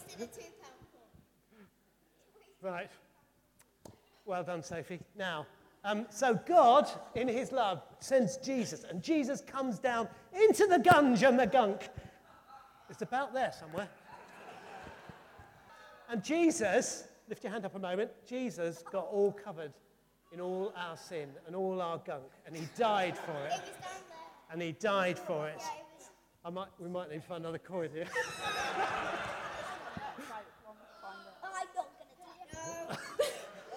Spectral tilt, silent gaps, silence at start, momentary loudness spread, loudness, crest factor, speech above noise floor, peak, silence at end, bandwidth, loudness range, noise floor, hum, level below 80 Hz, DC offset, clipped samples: -4.5 dB/octave; none; 0 s; 22 LU; -34 LUFS; 24 dB; 38 dB; -12 dBFS; 0 s; 18 kHz; 16 LU; -71 dBFS; none; -72 dBFS; under 0.1%; under 0.1%